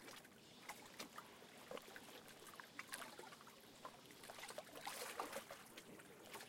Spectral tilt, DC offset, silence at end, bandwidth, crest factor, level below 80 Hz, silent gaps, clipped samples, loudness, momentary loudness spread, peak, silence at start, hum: -2 dB/octave; under 0.1%; 0 s; 16.5 kHz; 26 dB; -88 dBFS; none; under 0.1%; -55 LUFS; 10 LU; -30 dBFS; 0 s; none